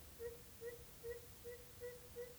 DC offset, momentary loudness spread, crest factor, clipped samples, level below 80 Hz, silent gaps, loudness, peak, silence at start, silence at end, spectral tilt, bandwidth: under 0.1%; 2 LU; 14 dB; under 0.1%; -66 dBFS; none; -53 LUFS; -38 dBFS; 0 s; 0 s; -3.5 dB/octave; over 20 kHz